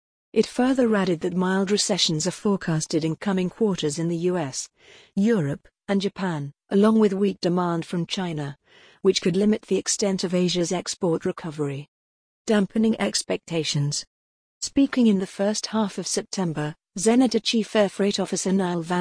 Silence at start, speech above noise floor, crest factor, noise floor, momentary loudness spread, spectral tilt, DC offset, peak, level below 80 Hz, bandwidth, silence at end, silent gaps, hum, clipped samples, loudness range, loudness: 0.35 s; over 67 dB; 16 dB; under -90 dBFS; 10 LU; -5 dB/octave; under 0.1%; -6 dBFS; -60 dBFS; 10.5 kHz; 0 s; 11.88-12.45 s, 14.07-14.61 s; none; under 0.1%; 3 LU; -24 LUFS